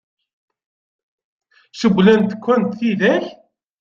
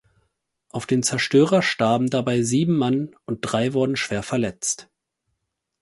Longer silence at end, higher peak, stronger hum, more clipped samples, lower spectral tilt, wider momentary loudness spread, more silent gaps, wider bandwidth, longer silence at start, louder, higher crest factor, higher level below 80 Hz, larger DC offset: second, 0.5 s vs 1 s; about the same, -2 dBFS vs -4 dBFS; neither; neither; first, -7 dB/octave vs -4.5 dB/octave; about the same, 8 LU vs 10 LU; neither; second, 7.4 kHz vs 11.5 kHz; first, 1.75 s vs 0.75 s; first, -16 LUFS vs -21 LUFS; about the same, 18 dB vs 18 dB; about the same, -58 dBFS vs -58 dBFS; neither